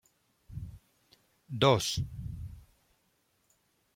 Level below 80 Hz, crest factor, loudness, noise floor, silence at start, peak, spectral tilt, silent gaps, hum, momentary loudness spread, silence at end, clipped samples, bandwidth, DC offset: -54 dBFS; 24 dB; -30 LUFS; -74 dBFS; 0.5 s; -10 dBFS; -4.5 dB/octave; none; none; 22 LU; 1.35 s; under 0.1%; 16.5 kHz; under 0.1%